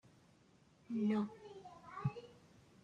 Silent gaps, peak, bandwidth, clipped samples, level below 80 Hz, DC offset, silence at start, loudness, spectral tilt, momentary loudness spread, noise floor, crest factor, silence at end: none; -26 dBFS; 9 kHz; under 0.1%; -76 dBFS; under 0.1%; 0.9 s; -41 LUFS; -8.5 dB/octave; 18 LU; -69 dBFS; 18 dB; 0.45 s